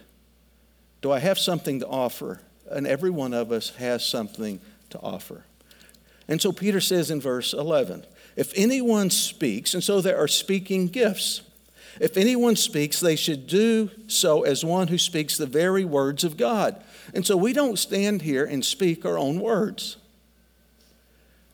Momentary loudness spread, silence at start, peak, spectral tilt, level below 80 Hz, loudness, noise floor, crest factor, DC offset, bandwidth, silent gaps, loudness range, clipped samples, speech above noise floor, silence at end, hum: 13 LU; 1.05 s; -8 dBFS; -4 dB/octave; -64 dBFS; -24 LUFS; -60 dBFS; 16 dB; under 0.1%; over 20 kHz; none; 6 LU; under 0.1%; 36 dB; 1.6 s; none